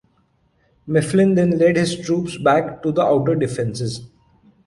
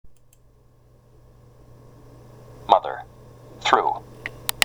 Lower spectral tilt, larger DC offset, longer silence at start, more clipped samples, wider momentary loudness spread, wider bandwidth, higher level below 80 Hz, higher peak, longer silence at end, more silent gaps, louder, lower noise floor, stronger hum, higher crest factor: first, -6.5 dB/octave vs -2 dB/octave; neither; first, 0.85 s vs 0.05 s; neither; second, 8 LU vs 26 LU; second, 11.5 kHz vs over 20 kHz; about the same, -52 dBFS vs -54 dBFS; second, -4 dBFS vs 0 dBFS; first, 0.6 s vs 0 s; neither; first, -18 LUFS vs -23 LUFS; first, -62 dBFS vs -54 dBFS; neither; second, 16 dB vs 26 dB